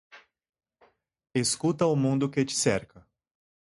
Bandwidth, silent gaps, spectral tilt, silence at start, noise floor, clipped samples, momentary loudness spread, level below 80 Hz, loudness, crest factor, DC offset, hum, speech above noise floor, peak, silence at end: 11.5 kHz; none; -4.5 dB/octave; 0.15 s; -65 dBFS; under 0.1%; 5 LU; -62 dBFS; -27 LUFS; 20 dB; under 0.1%; none; 39 dB; -10 dBFS; 0.85 s